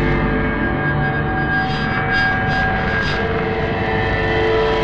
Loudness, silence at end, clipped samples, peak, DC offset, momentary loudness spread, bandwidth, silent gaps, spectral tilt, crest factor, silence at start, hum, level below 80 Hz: -18 LUFS; 0 s; under 0.1%; -4 dBFS; 0.7%; 3 LU; 8.4 kHz; none; -7 dB/octave; 14 dB; 0 s; none; -28 dBFS